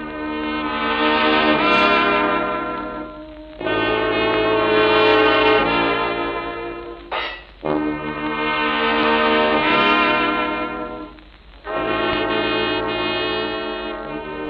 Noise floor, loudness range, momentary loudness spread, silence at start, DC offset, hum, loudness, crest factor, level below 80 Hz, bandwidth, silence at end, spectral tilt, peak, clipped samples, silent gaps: -43 dBFS; 5 LU; 14 LU; 0 s; under 0.1%; none; -18 LUFS; 16 dB; -44 dBFS; 6.8 kHz; 0 s; -6.5 dB/octave; -2 dBFS; under 0.1%; none